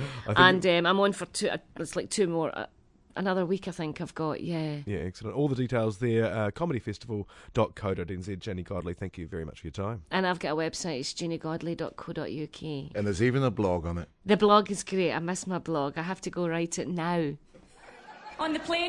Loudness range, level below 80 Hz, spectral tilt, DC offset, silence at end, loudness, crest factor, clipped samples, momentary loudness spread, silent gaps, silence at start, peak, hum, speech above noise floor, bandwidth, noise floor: 6 LU; -56 dBFS; -5 dB/octave; under 0.1%; 0 s; -29 LUFS; 24 dB; under 0.1%; 13 LU; none; 0 s; -4 dBFS; none; 24 dB; 11.5 kHz; -53 dBFS